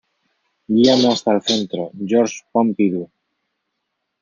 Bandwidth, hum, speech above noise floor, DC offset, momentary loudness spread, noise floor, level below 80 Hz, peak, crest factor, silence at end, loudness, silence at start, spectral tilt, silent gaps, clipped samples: 7.6 kHz; none; 59 dB; under 0.1%; 12 LU; -76 dBFS; -62 dBFS; -2 dBFS; 18 dB; 1.15 s; -18 LUFS; 0.7 s; -5 dB/octave; none; under 0.1%